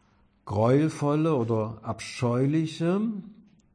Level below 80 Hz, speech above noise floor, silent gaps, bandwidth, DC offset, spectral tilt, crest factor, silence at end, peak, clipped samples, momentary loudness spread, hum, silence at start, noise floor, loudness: -64 dBFS; 24 dB; none; 10.5 kHz; under 0.1%; -7.5 dB/octave; 16 dB; 0.4 s; -12 dBFS; under 0.1%; 10 LU; none; 0.45 s; -49 dBFS; -26 LUFS